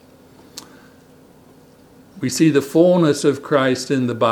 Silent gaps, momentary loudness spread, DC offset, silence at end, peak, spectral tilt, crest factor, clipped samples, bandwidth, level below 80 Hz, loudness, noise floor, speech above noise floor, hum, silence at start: none; 24 LU; under 0.1%; 0 s; -2 dBFS; -5.5 dB/octave; 18 dB; under 0.1%; 19 kHz; -64 dBFS; -17 LUFS; -48 dBFS; 32 dB; none; 0.55 s